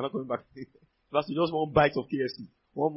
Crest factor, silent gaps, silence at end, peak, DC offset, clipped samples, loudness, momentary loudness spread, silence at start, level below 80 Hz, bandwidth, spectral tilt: 20 dB; none; 0 s; -8 dBFS; under 0.1%; under 0.1%; -29 LUFS; 22 LU; 0 s; -56 dBFS; 5.8 kHz; -10 dB/octave